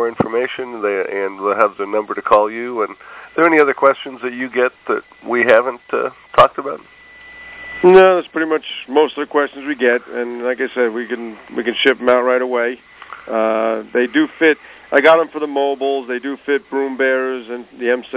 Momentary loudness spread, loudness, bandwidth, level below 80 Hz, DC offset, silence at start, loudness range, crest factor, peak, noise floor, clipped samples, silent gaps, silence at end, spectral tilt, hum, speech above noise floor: 13 LU; -16 LUFS; 4 kHz; -56 dBFS; under 0.1%; 0 s; 3 LU; 16 dB; 0 dBFS; -39 dBFS; under 0.1%; none; 0 s; -8.5 dB/octave; none; 23 dB